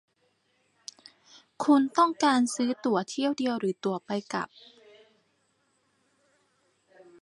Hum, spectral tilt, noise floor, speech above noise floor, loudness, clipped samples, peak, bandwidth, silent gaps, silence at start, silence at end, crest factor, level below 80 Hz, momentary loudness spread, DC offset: none; -4.5 dB/octave; -72 dBFS; 45 dB; -27 LUFS; under 0.1%; -10 dBFS; 11.5 kHz; none; 1.6 s; 2.8 s; 20 dB; -80 dBFS; 20 LU; under 0.1%